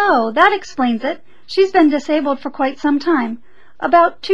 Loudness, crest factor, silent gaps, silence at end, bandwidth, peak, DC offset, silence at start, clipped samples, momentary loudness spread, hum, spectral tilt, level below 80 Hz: -16 LUFS; 16 dB; none; 0 s; 8 kHz; 0 dBFS; 2%; 0 s; under 0.1%; 12 LU; none; -4.5 dB/octave; -54 dBFS